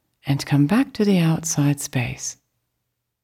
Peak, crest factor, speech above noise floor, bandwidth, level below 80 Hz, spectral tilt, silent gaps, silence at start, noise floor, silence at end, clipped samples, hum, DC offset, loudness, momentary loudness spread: -8 dBFS; 14 dB; 57 dB; 16.5 kHz; -54 dBFS; -5.5 dB/octave; none; 0.25 s; -77 dBFS; 0.9 s; under 0.1%; none; under 0.1%; -21 LUFS; 9 LU